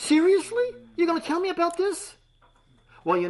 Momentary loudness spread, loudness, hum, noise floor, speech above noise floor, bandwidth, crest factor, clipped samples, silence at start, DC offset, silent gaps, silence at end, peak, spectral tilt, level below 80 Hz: 14 LU; -25 LUFS; none; -60 dBFS; 36 dB; 11.5 kHz; 14 dB; under 0.1%; 0 s; under 0.1%; none; 0 s; -10 dBFS; -4 dB/octave; -64 dBFS